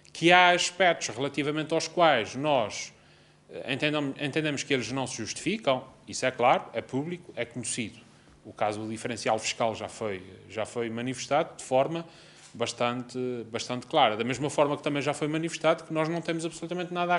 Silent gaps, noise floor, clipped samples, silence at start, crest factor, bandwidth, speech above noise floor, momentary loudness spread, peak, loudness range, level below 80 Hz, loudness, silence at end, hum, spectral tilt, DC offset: none; -58 dBFS; under 0.1%; 0.15 s; 24 dB; 11.5 kHz; 30 dB; 12 LU; -4 dBFS; 4 LU; -68 dBFS; -28 LUFS; 0 s; none; -4 dB/octave; under 0.1%